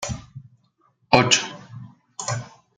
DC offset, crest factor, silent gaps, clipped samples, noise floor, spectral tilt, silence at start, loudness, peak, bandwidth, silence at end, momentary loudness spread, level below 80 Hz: under 0.1%; 24 dB; none; under 0.1%; -64 dBFS; -3 dB/octave; 0 s; -21 LUFS; 0 dBFS; 10.5 kHz; 0.3 s; 24 LU; -52 dBFS